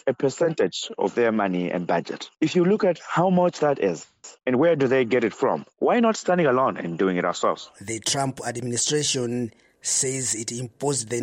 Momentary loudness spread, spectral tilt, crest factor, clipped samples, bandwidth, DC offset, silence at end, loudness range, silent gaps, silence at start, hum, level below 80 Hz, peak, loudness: 9 LU; -4 dB/octave; 14 dB; under 0.1%; 16 kHz; under 0.1%; 0 s; 3 LU; none; 0.05 s; none; -66 dBFS; -8 dBFS; -23 LUFS